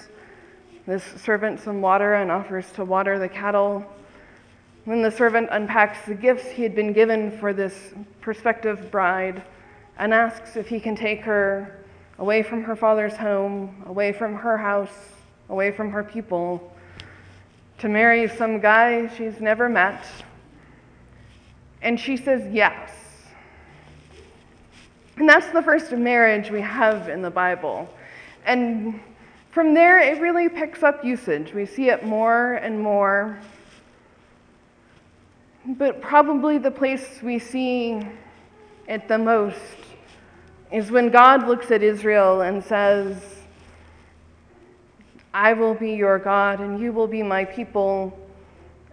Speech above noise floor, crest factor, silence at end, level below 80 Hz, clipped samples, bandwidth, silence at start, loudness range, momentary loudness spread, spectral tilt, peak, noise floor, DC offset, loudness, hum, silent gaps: 34 dB; 22 dB; 0.65 s; -58 dBFS; under 0.1%; 10.5 kHz; 0.85 s; 7 LU; 15 LU; -6 dB/octave; 0 dBFS; -55 dBFS; under 0.1%; -20 LUFS; none; none